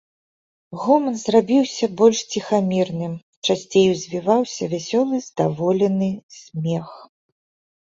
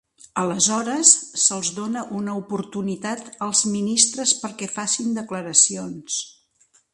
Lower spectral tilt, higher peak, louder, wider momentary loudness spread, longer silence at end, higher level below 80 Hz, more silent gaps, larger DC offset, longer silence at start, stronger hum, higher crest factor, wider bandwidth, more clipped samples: first, -5.5 dB/octave vs -2 dB/octave; about the same, -2 dBFS vs 0 dBFS; about the same, -20 LUFS vs -20 LUFS; about the same, 11 LU vs 13 LU; first, 0.8 s vs 0.6 s; first, -62 dBFS vs -68 dBFS; first, 3.23-3.42 s, 6.23-6.29 s vs none; neither; first, 0.7 s vs 0.35 s; neither; about the same, 18 dB vs 22 dB; second, 7.8 kHz vs 11.5 kHz; neither